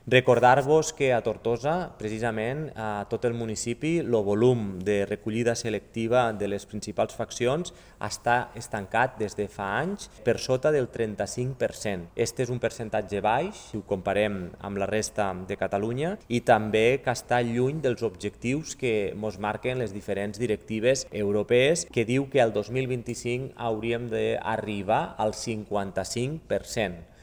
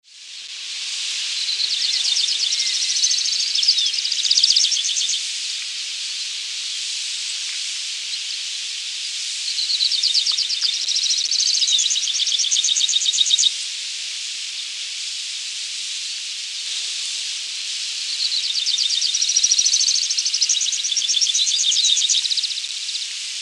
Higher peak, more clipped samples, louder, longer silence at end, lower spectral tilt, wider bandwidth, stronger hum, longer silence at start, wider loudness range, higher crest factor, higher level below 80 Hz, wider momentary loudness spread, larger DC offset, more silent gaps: about the same, -4 dBFS vs -2 dBFS; neither; second, -27 LUFS vs -18 LUFS; first, 0.2 s vs 0 s; first, -5 dB/octave vs 8 dB/octave; first, over 20 kHz vs 13.5 kHz; neither; about the same, 0.05 s vs 0.15 s; second, 3 LU vs 8 LU; about the same, 22 dB vs 20 dB; first, -54 dBFS vs under -90 dBFS; about the same, 9 LU vs 10 LU; neither; neither